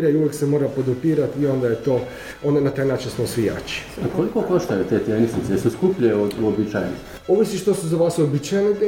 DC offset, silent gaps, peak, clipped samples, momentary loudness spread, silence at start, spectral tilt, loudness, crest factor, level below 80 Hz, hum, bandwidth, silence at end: under 0.1%; none; -6 dBFS; under 0.1%; 6 LU; 0 s; -6.5 dB/octave; -21 LUFS; 16 dB; -48 dBFS; none; 16.5 kHz; 0 s